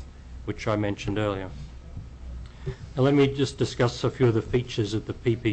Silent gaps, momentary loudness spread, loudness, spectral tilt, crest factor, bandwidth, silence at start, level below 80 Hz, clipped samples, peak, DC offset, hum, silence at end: none; 19 LU; -26 LUFS; -6.5 dB/octave; 14 dB; 8.6 kHz; 0 s; -42 dBFS; under 0.1%; -12 dBFS; under 0.1%; none; 0 s